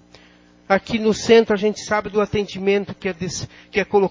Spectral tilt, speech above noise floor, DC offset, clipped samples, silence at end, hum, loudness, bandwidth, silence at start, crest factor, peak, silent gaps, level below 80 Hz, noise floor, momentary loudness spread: -5 dB/octave; 32 dB; under 0.1%; under 0.1%; 0 s; none; -20 LUFS; 7.6 kHz; 0.7 s; 18 dB; -2 dBFS; none; -48 dBFS; -51 dBFS; 12 LU